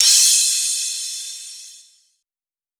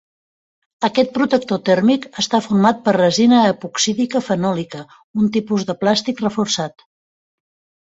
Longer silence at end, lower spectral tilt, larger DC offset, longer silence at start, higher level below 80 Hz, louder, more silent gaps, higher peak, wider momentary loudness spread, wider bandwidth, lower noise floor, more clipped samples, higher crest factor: about the same, 1.05 s vs 1.15 s; second, 8 dB/octave vs -4.5 dB/octave; neither; second, 0 s vs 0.8 s; second, -82 dBFS vs -58 dBFS; about the same, -15 LUFS vs -17 LUFS; second, none vs 5.04-5.14 s; about the same, 0 dBFS vs -2 dBFS; first, 23 LU vs 8 LU; first, over 20 kHz vs 8 kHz; about the same, under -90 dBFS vs under -90 dBFS; neither; about the same, 20 dB vs 16 dB